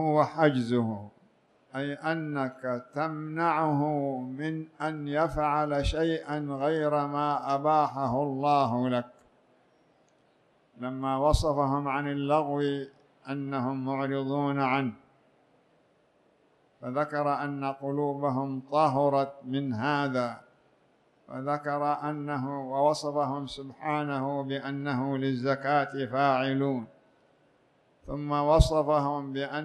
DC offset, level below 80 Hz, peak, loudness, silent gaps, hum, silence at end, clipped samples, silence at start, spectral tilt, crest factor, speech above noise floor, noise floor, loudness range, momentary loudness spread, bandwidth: under 0.1%; -44 dBFS; -6 dBFS; -29 LUFS; none; none; 0 s; under 0.1%; 0 s; -7 dB/octave; 22 dB; 38 dB; -66 dBFS; 4 LU; 10 LU; 12.5 kHz